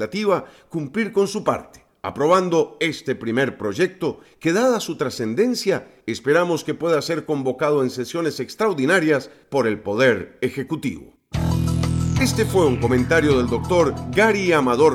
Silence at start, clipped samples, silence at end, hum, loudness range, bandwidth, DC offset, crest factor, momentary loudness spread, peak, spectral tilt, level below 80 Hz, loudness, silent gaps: 0 s; under 0.1%; 0 s; none; 3 LU; 16.5 kHz; under 0.1%; 16 dB; 9 LU; -4 dBFS; -5.5 dB/octave; -40 dBFS; -21 LUFS; none